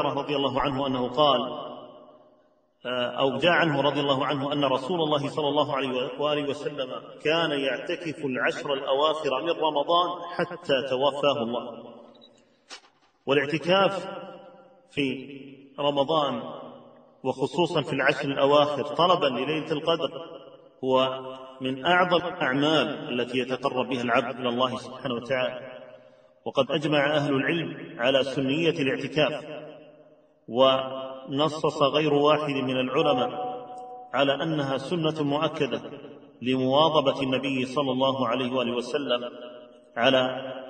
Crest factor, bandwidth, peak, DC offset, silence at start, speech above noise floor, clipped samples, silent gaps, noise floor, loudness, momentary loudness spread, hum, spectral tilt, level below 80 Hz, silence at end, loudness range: 20 dB; 9.4 kHz; -6 dBFS; under 0.1%; 0 s; 38 dB; under 0.1%; none; -63 dBFS; -25 LUFS; 16 LU; none; -5.5 dB/octave; -64 dBFS; 0 s; 4 LU